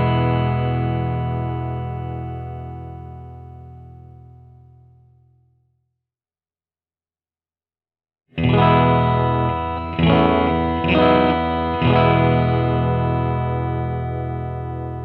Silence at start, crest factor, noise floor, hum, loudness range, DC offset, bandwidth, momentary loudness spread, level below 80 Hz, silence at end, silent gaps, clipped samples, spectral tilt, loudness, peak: 0 s; 20 dB; under -90 dBFS; none; 17 LU; under 0.1%; 4.5 kHz; 18 LU; -36 dBFS; 0 s; none; under 0.1%; -10 dB/octave; -19 LUFS; -2 dBFS